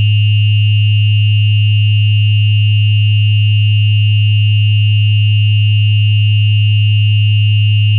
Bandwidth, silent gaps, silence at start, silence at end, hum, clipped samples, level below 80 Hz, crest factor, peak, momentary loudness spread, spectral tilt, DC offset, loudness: 3.6 kHz; none; 0 s; 0 s; none; under 0.1%; -48 dBFS; 4 dB; -4 dBFS; 0 LU; -7.5 dB/octave; under 0.1%; -11 LUFS